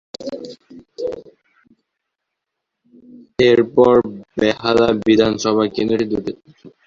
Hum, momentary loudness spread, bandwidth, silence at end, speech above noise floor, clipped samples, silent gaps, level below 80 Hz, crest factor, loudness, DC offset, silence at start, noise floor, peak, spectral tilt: none; 18 LU; 7.6 kHz; 0.2 s; 63 dB; under 0.1%; none; -50 dBFS; 18 dB; -16 LUFS; under 0.1%; 0.2 s; -79 dBFS; -2 dBFS; -5.5 dB/octave